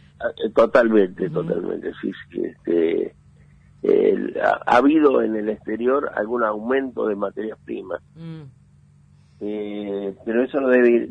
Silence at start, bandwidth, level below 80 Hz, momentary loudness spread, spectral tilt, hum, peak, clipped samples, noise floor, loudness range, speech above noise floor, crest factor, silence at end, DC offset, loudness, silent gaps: 0.2 s; 8.6 kHz; -58 dBFS; 15 LU; -7.5 dB/octave; none; -4 dBFS; under 0.1%; -52 dBFS; 9 LU; 32 dB; 18 dB; 0 s; under 0.1%; -21 LUFS; none